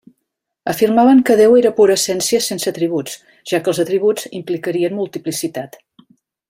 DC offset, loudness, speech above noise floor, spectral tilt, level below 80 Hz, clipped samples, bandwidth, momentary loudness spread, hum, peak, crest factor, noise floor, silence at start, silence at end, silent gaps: under 0.1%; -15 LUFS; 60 dB; -4 dB/octave; -60 dBFS; under 0.1%; 16.5 kHz; 14 LU; none; 0 dBFS; 16 dB; -75 dBFS; 0.65 s; 0.85 s; none